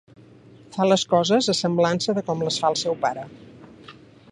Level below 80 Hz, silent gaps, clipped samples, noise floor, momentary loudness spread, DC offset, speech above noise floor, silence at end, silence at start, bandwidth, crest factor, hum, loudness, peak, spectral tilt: -64 dBFS; none; under 0.1%; -48 dBFS; 10 LU; under 0.1%; 27 dB; 0.4 s; 0.7 s; 11 kHz; 18 dB; none; -22 LUFS; -6 dBFS; -4.5 dB/octave